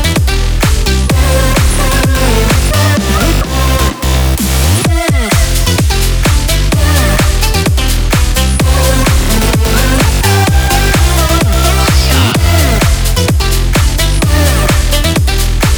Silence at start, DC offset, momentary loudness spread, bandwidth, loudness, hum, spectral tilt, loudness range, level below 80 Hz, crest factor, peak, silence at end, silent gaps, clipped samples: 0 s; under 0.1%; 2 LU; over 20 kHz; -10 LUFS; none; -4.5 dB/octave; 1 LU; -12 dBFS; 8 dB; 0 dBFS; 0 s; none; under 0.1%